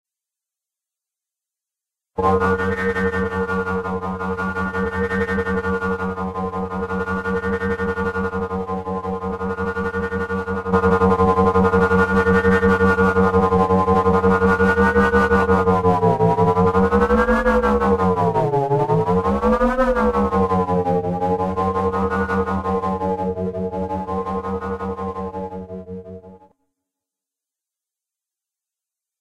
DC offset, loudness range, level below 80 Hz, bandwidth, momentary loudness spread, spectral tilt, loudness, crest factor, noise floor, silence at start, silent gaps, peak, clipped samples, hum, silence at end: 0.4%; 9 LU; -36 dBFS; 11.5 kHz; 10 LU; -8 dB/octave; -19 LUFS; 16 dB; -87 dBFS; 2.15 s; none; -4 dBFS; under 0.1%; none; 2.85 s